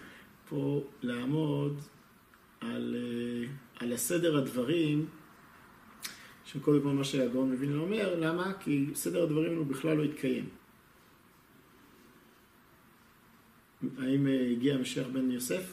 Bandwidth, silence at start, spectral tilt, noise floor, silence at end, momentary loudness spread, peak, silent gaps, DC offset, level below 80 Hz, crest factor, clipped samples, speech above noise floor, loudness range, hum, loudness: 15 kHz; 0 s; -5.5 dB/octave; -61 dBFS; 0 s; 13 LU; -14 dBFS; none; under 0.1%; -70 dBFS; 20 dB; under 0.1%; 30 dB; 6 LU; none; -32 LUFS